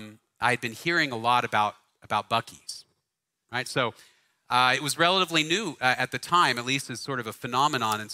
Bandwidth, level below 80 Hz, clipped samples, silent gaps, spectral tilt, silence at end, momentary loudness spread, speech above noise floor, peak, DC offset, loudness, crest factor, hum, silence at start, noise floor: 16 kHz; -68 dBFS; under 0.1%; none; -3 dB/octave; 0 s; 10 LU; 56 dB; -6 dBFS; under 0.1%; -25 LUFS; 22 dB; none; 0 s; -83 dBFS